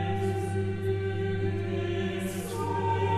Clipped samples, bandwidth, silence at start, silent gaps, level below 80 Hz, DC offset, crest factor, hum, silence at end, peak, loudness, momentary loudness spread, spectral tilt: under 0.1%; 14 kHz; 0 s; none; -54 dBFS; under 0.1%; 12 dB; none; 0 s; -16 dBFS; -30 LUFS; 3 LU; -7 dB/octave